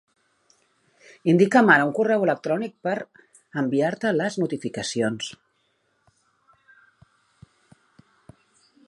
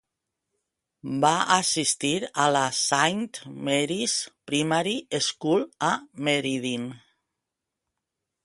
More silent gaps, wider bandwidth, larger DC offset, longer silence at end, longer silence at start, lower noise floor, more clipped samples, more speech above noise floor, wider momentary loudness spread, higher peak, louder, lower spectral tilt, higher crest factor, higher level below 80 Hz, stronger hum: neither; about the same, 11.5 kHz vs 11.5 kHz; neither; first, 3.55 s vs 1.45 s; first, 1.25 s vs 1.05 s; second, -69 dBFS vs -85 dBFS; neither; second, 48 dB vs 60 dB; first, 14 LU vs 10 LU; about the same, -2 dBFS vs -4 dBFS; first, -22 LUFS vs -25 LUFS; first, -5.5 dB/octave vs -3 dB/octave; about the same, 22 dB vs 22 dB; about the same, -70 dBFS vs -70 dBFS; neither